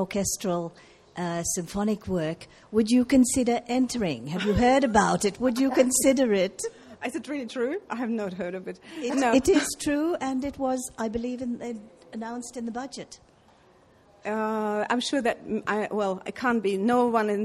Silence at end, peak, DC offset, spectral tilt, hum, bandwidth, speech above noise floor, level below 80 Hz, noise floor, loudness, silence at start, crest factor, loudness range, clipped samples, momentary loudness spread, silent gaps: 0 s; -6 dBFS; under 0.1%; -4.5 dB/octave; none; 14 kHz; 32 dB; -52 dBFS; -58 dBFS; -26 LUFS; 0 s; 20 dB; 10 LU; under 0.1%; 15 LU; none